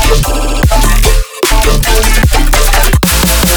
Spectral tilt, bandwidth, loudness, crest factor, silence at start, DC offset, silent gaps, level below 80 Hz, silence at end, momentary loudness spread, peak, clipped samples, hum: -3.5 dB/octave; over 20 kHz; -10 LUFS; 8 dB; 0 s; under 0.1%; none; -10 dBFS; 0 s; 4 LU; 0 dBFS; under 0.1%; none